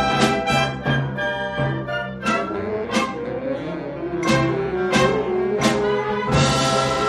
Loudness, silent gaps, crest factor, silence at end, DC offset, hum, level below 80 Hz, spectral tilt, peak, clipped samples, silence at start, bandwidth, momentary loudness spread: -21 LUFS; none; 16 dB; 0 s; under 0.1%; none; -42 dBFS; -5 dB/octave; -4 dBFS; under 0.1%; 0 s; 13 kHz; 8 LU